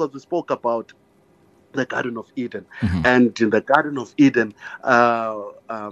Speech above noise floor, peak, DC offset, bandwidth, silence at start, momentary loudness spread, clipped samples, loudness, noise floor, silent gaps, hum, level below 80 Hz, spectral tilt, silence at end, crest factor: 36 dB; -2 dBFS; under 0.1%; 8 kHz; 0 s; 14 LU; under 0.1%; -20 LUFS; -56 dBFS; none; none; -50 dBFS; -6.5 dB/octave; 0 s; 20 dB